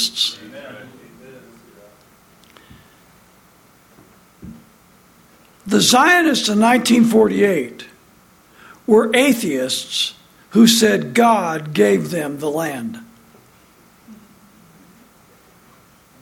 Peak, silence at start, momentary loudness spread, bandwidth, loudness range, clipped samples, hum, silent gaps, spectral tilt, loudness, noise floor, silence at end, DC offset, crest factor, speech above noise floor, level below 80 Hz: 0 dBFS; 0 s; 21 LU; 16.5 kHz; 13 LU; under 0.1%; none; none; -3.5 dB/octave; -15 LUFS; -51 dBFS; 2.1 s; under 0.1%; 18 dB; 35 dB; -60 dBFS